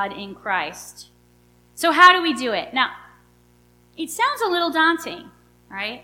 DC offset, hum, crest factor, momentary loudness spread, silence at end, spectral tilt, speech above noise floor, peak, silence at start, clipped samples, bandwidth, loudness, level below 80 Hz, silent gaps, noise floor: under 0.1%; 60 Hz at -55 dBFS; 22 dB; 22 LU; 0.05 s; -2 dB/octave; 35 dB; 0 dBFS; 0 s; under 0.1%; 17.5 kHz; -19 LUFS; -62 dBFS; none; -56 dBFS